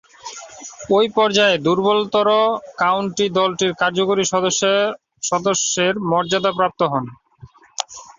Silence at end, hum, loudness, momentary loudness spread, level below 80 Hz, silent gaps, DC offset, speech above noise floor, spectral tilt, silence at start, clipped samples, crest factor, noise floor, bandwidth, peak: 0.15 s; none; -18 LUFS; 16 LU; -60 dBFS; none; under 0.1%; 28 dB; -3 dB/octave; 0.25 s; under 0.1%; 18 dB; -45 dBFS; 7.8 kHz; 0 dBFS